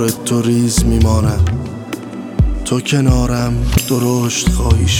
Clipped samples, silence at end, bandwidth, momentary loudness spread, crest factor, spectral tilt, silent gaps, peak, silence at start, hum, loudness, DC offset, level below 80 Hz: under 0.1%; 0 s; 17.5 kHz; 10 LU; 12 dB; -5.5 dB/octave; none; -2 dBFS; 0 s; none; -15 LUFS; under 0.1%; -20 dBFS